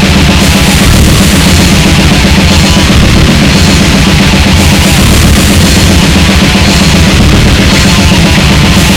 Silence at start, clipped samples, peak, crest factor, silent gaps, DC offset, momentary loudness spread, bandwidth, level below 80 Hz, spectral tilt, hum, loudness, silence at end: 0 s; 10%; 0 dBFS; 4 dB; none; under 0.1%; 0 LU; over 20 kHz; -10 dBFS; -4.5 dB/octave; none; -4 LUFS; 0 s